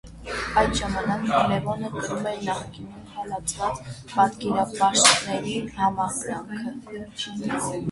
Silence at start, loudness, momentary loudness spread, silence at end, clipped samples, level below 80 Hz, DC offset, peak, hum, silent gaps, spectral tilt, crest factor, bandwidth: 0.05 s; -24 LUFS; 14 LU; 0 s; under 0.1%; -46 dBFS; under 0.1%; -2 dBFS; none; none; -3 dB/octave; 24 dB; 11.5 kHz